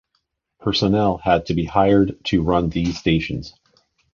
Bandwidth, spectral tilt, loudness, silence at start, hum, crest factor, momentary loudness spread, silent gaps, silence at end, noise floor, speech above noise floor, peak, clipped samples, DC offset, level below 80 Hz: 7.2 kHz; -7 dB/octave; -19 LUFS; 0.6 s; none; 18 dB; 11 LU; none; 0.65 s; -72 dBFS; 53 dB; -2 dBFS; under 0.1%; under 0.1%; -38 dBFS